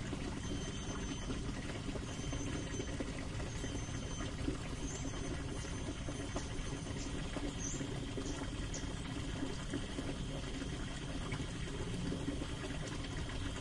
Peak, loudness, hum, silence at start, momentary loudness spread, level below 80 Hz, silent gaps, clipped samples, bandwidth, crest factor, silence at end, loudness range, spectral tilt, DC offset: -24 dBFS; -42 LUFS; none; 0 s; 2 LU; -46 dBFS; none; under 0.1%; 11.5 kHz; 16 dB; 0 s; 0 LU; -4.5 dB/octave; under 0.1%